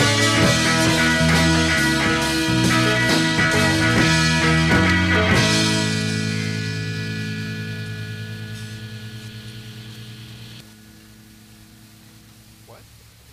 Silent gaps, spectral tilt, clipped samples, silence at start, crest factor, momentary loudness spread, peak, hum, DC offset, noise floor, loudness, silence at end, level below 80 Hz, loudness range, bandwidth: none; -4 dB/octave; under 0.1%; 0 s; 16 dB; 20 LU; -4 dBFS; none; under 0.1%; -47 dBFS; -18 LUFS; 0.55 s; -38 dBFS; 20 LU; 15.5 kHz